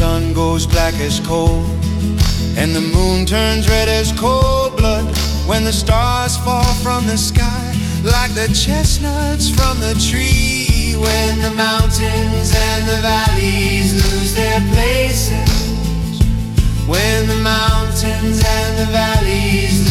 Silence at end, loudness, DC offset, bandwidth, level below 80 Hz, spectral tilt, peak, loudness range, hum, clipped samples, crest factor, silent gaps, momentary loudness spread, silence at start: 0 s; -15 LUFS; under 0.1%; 16.5 kHz; -20 dBFS; -4.5 dB/octave; 0 dBFS; 1 LU; none; under 0.1%; 14 dB; none; 3 LU; 0 s